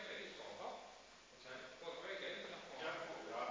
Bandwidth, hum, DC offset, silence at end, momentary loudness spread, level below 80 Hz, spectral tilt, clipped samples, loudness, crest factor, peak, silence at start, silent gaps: 7.6 kHz; none; under 0.1%; 0 s; 12 LU; -82 dBFS; -2.5 dB/octave; under 0.1%; -49 LUFS; 18 dB; -32 dBFS; 0 s; none